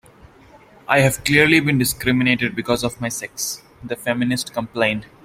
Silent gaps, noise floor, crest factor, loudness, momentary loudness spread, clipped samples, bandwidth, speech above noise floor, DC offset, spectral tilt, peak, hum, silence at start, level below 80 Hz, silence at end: none; -48 dBFS; 20 dB; -19 LUFS; 12 LU; under 0.1%; 16.5 kHz; 28 dB; under 0.1%; -4.5 dB/octave; 0 dBFS; none; 0.9 s; -48 dBFS; 0.2 s